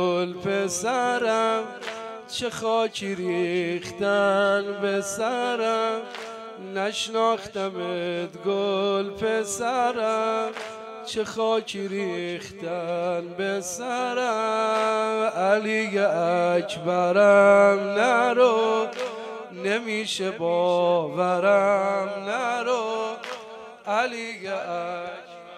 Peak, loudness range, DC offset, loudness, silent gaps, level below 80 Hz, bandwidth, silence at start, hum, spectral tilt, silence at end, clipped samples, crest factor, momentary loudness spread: -4 dBFS; 7 LU; under 0.1%; -24 LUFS; none; -68 dBFS; 13.5 kHz; 0 s; none; -4 dB/octave; 0 s; under 0.1%; 20 dB; 12 LU